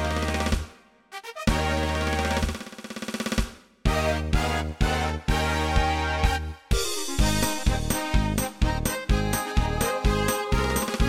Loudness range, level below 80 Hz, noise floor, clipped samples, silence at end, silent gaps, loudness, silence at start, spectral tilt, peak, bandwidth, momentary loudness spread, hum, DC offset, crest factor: 3 LU; -30 dBFS; -49 dBFS; under 0.1%; 0 s; none; -26 LUFS; 0 s; -4.5 dB/octave; -8 dBFS; 16.5 kHz; 7 LU; none; under 0.1%; 18 dB